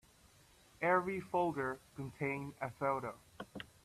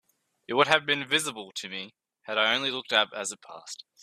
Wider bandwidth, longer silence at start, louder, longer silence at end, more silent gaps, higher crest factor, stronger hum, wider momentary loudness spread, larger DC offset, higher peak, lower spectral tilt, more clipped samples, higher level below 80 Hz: about the same, 14.5 kHz vs 15 kHz; first, 0.8 s vs 0.5 s; second, -38 LUFS vs -26 LUFS; about the same, 0.2 s vs 0.25 s; neither; about the same, 20 dB vs 24 dB; neither; second, 16 LU vs 19 LU; neither; second, -18 dBFS vs -4 dBFS; first, -6.5 dB/octave vs -2 dB/octave; neither; first, -70 dBFS vs -76 dBFS